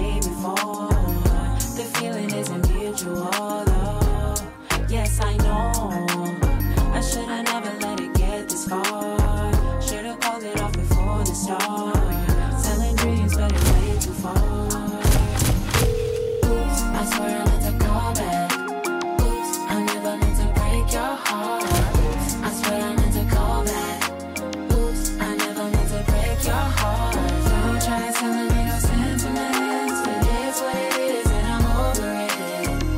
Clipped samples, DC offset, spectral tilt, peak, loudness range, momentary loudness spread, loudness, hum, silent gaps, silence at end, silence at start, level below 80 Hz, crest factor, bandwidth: under 0.1%; under 0.1%; -5 dB/octave; -6 dBFS; 2 LU; 4 LU; -23 LUFS; none; none; 0 s; 0 s; -24 dBFS; 14 dB; 16.5 kHz